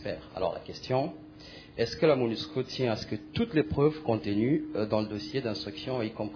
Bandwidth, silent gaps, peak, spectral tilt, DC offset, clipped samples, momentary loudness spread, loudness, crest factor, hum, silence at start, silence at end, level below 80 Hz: 5.4 kHz; none; -12 dBFS; -7 dB/octave; under 0.1%; under 0.1%; 11 LU; -30 LUFS; 18 dB; none; 0 s; 0 s; -56 dBFS